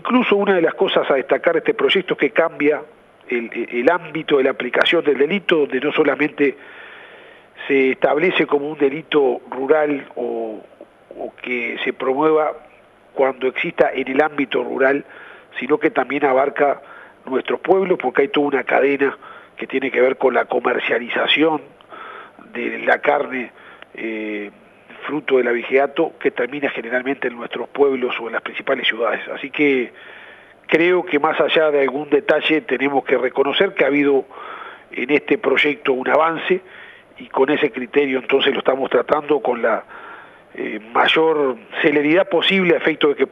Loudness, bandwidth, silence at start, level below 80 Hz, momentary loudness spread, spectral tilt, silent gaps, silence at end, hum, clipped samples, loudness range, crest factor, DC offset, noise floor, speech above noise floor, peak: -18 LUFS; 6.2 kHz; 0.05 s; -68 dBFS; 14 LU; -6.5 dB/octave; none; 0.05 s; none; under 0.1%; 4 LU; 18 dB; under 0.1%; -49 dBFS; 31 dB; 0 dBFS